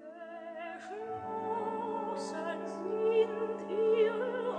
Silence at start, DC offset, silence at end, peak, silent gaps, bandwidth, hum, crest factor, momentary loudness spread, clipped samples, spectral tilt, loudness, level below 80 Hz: 0 s; under 0.1%; 0 s; -18 dBFS; none; 9.6 kHz; none; 16 dB; 14 LU; under 0.1%; -5.5 dB/octave; -34 LUFS; -82 dBFS